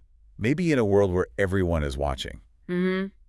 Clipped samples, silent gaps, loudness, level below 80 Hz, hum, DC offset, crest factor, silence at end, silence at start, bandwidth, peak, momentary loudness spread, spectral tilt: under 0.1%; none; -25 LUFS; -40 dBFS; none; under 0.1%; 16 dB; 0.2 s; 0.4 s; 12 kHz; -10 dBFS; 11 LU; -7 dB/octave